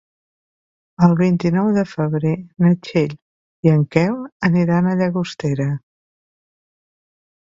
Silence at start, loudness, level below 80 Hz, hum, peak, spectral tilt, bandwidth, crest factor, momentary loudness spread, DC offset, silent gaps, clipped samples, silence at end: 1 s; -18 LUFS; -56 dBFS; none; 0 dBFS; -8.5 dB/octave; 7.4 kHz; 18 dB; 7 LU; under 0.1%; 3.22-3.63 s, 4.32-4.40 s; under 0.1%; 1.75 s